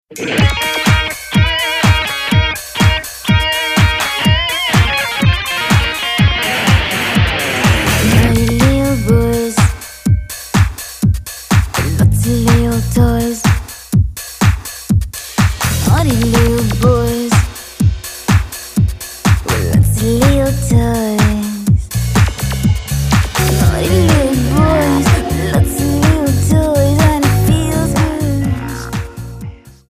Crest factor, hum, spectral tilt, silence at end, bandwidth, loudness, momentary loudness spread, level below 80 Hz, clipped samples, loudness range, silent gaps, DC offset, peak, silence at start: 12 dB; none; -5 dB/octave; 0.2 s; 15.5 kHz; -13 LUFS; 6 LU; -22 dBFS; under 0.1%; 2 LU; none; under 0.1%; 0 dBFS; 0.1 s